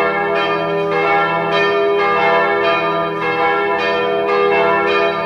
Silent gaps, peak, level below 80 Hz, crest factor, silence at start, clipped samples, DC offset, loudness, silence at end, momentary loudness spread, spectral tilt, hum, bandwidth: none; -2 dBFS; -54 dBFS; 12 dB; 0 s; under 0.1%; under 0.1%; -15 LUFS; 0 s; 4 LU; -5.5 dB/octave; none; 7 kHz